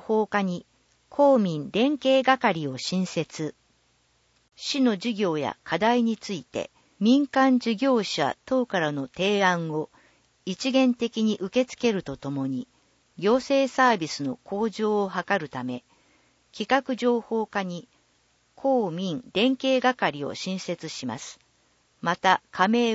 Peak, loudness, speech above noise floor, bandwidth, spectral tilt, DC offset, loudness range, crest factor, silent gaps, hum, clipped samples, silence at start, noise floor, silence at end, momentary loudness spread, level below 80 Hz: -6 dBFS; -25 LUFS; 42 dB; 8 kHz; -5 dB/octave; under 0.1%; 4 LU; 20 dB; none; none; under 0.1%; 0.05 s; -66 dBFS; 0 s; 13 LU; -68 dBFS